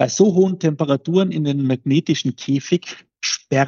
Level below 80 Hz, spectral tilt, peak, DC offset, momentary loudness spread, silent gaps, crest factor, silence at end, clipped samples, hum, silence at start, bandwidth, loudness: -72 dBFS; -5.5 dB/octave; -2 dBFS; under 0.1%; 8 LU; none; 16 dB; 0 s; under 0.1%; none; 0 s; 7.4 kHz; -19 LUFS